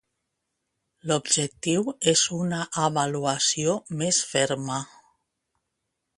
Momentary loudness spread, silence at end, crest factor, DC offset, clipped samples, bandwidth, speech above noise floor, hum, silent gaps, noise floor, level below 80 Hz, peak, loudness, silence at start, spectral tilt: 7 LU; 1.3 s; 24 dB; under 0.1%; under 0.1%; 11.5 kHz; 55 dB; none; none; -81 dBFS; -66 dBFS; -4 dBFS; -24 LUFS; 1.05 s; -3 dB/octave